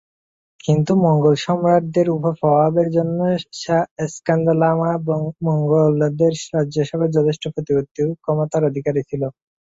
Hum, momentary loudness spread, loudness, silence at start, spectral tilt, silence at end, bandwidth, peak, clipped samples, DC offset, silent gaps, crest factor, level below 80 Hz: none; 7 LU; -19 LUFS; 0.65 s; -7.5 dB/octave; 0.4 s; 7.8 kHz; -4 dBFS; under 0.1%; under 0.1%; 3.91-3.96 s, 7.91-7.95 s; 14 dB; -56 dBFS